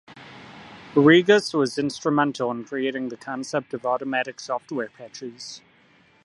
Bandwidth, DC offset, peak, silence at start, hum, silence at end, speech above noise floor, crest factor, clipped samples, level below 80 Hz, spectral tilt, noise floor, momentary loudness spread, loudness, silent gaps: 11.5 kHz; under 0.1%; -4 dBFS; 0.1 s; none; 0.65 s; 35 dB; 20 dB; under 0.1%; -70 dBFS; -5 dB/octave; -57 dBFS; 27 LU; -23 LUFS; none